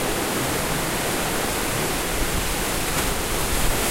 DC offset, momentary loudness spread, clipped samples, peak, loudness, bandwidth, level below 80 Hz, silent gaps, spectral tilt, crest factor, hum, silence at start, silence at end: under 0.1%; 1 LU; under 0.1%; -8 dBFS; -23 LUFS; 16 kHz; -32 dBFS; none; -3 dB/octave; 16 dB; none; 0 s; 0 s